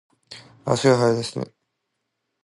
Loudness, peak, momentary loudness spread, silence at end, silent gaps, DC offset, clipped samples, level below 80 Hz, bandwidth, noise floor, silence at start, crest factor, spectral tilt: -21 LUFS; -4 dBFS; 25 LU; 1 s; none; under 0.1%; under 0.1%; -62 dBFS; 11.5 kHz; -78 dBFS; 0.3 s; 20 dB; -5.5 dB/octave